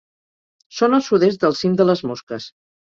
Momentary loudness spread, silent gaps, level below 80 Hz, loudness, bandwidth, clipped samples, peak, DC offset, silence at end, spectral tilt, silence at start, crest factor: 16 LU; 2.23-2.27 s; -62 dBFS; -18 LUFS; 7.4 kHz; under 0.1%; -2 dBFS; under 0.1%; 0.4 s; -6 dB/octave; 0.75 s; 18 dB